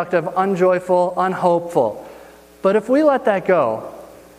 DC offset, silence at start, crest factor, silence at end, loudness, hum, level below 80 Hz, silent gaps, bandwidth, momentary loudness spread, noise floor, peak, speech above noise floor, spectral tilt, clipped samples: under 0.1%; 0 s; 16 dB; 0.3 s; -18 LUFS; none; -60 dBFS; none; 15 kHz; 7 LU; -43 dBFS; -2 dBFS; 26 dB; -7 dB/octave; under 0.1%